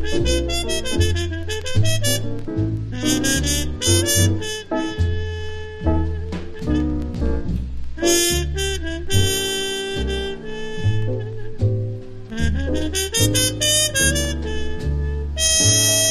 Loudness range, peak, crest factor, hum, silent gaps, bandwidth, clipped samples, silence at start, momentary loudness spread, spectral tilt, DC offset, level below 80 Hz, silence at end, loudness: 5 LU; -4 dBFS; 16 dB; none; none; 13.5 kHz; under 0.1%; 0 s; 12 LU; -3.5 dB/octave; under 0.1%; -28 dBFS; 0 s; -20 LUFS